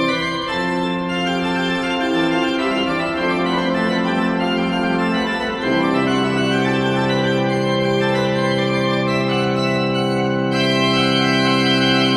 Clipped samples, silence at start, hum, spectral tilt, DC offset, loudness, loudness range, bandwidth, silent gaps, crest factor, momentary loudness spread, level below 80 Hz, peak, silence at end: under 0.1%; 0 s; none; -5.5 dB/octave; under 0.1%; -18 LUFS; 2 LU; 12.5 kHz; none; 14 dB; 4 LU; -48 dBFS; -4 dBFS; 0 s